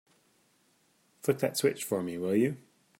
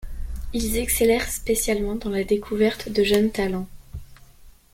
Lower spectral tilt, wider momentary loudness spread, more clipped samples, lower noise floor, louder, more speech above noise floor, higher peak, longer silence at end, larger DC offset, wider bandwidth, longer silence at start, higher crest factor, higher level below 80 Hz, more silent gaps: about the same, -5 dB/octave vs -4 dB/octave; second, 6 LU vs 17 LU; neither; first, -69 dBFS vs -48 dBFS; second, -30 LUFS vs -23 LUFS; first, 40 dB vs 26 dB; second, -12 dBFS vs -6 dBFS; first, 0.4 s vs 0.25 s; neither; about the same, 16 kHz vs 16.5 kHz; first, 1.25 s vs 0 s; about the same, 20 dB vs 18 dB; second, -78 dBFS vs -36 dBFS; neither